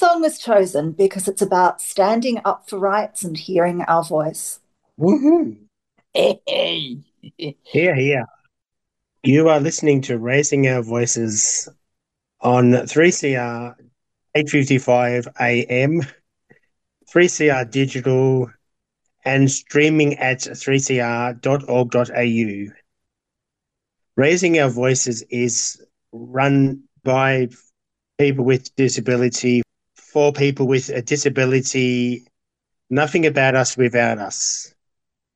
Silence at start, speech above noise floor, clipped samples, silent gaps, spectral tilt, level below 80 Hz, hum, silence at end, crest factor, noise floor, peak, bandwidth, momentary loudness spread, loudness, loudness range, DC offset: 0 s; 65 dB; under 0.1%; none; -4.5 dB/octave; -64 dBFS; none; 0.7 s; 16 dB; -82 dBFS; -2 dBFS; 12.5 kHz; 10 LU; -18 LUFS; 3 LU; under 0.1%